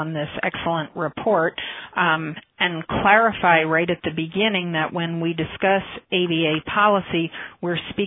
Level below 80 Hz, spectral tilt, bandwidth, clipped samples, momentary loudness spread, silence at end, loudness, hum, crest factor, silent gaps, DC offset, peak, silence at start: -52 dBFS; -9 dB/octave; 4 kHz; under 0.1%; 10 LU; 0 s; -21 LUFS; none; 20 dB; none; under 0.1%; 0 dBFS; 0 s